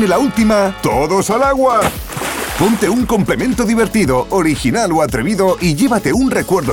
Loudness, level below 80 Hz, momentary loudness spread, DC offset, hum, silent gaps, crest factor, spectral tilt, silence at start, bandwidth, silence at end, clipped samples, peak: -14 LUFS; -32 dBFS; 3 LU; under 0.1%; none; none; 12 dB; -5 dB/octave; 0 s; 18.5 kHz; 0 s; under 0.1%; -2 dBFS